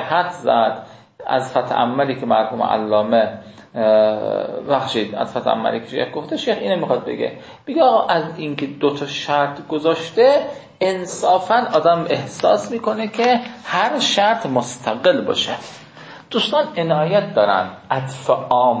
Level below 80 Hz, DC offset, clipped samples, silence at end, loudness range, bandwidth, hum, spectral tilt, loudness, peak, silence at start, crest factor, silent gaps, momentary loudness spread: -62 dBFS; under 0.1%; under 0.1%; 0 s; 2 LU; 8 kHz; none; -4.5 dB/octave; -18 LUFS; -2 dBFS; 0 s; 16 dB; none; 9 LU